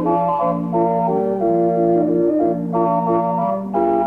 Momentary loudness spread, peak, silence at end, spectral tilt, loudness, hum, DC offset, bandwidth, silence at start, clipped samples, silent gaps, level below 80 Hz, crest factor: 3 LU; -6 dBFS; 0 s; -11 dB/octave; -18 LUFS; none; under 0.1%; 3.6 kHz; 0 s; under 0.1%; none; -52 dBFS; 12 dB